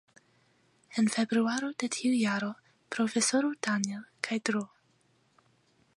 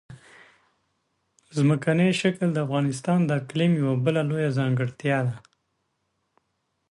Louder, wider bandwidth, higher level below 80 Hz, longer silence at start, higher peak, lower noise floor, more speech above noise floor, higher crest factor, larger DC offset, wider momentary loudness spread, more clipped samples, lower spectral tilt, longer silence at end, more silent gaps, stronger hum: second, -30 LUFS vs -24 LUFS; about the same, 11.5 kHz vs 11.5 kHz; second, -82 dBFS vs -66 dBFS; first, 0.9 s vs 0.1 s; about the same, -10 dBFS vs -10 dBFS; second, -69 dBFS vs -75 dBFS; second, 39 dB vs 52 dB; first, 22 dB vs 16 dB; neither; first, 11 LU vs 5 LU; neither; second, -3.5 dB/octave vs -7 dB/octave; second, 1.3 s vs 1.55 s; neither; neither